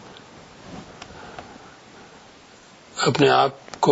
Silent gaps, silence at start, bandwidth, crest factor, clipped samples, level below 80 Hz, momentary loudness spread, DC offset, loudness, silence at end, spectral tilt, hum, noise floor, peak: none; 0.7 s; 8 kHz; 22 dB; under 0.1%; -60 dBFS; 28 LU; under 0.1%; -20 LUFS; 0 s; -4.5 dB/octave; none; -49 dBFS; -4 dBFS